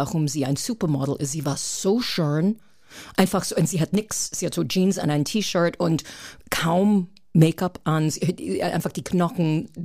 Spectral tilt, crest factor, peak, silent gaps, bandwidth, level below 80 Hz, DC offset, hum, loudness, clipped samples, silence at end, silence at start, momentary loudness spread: -5.5 dB/octave; 18 dB; -6 dBFS; none; 15.5 kHz; -54 dBFS; 0.2%; none; -23 LUFS; under 0.1%; 0 s; 0 s; 6 LU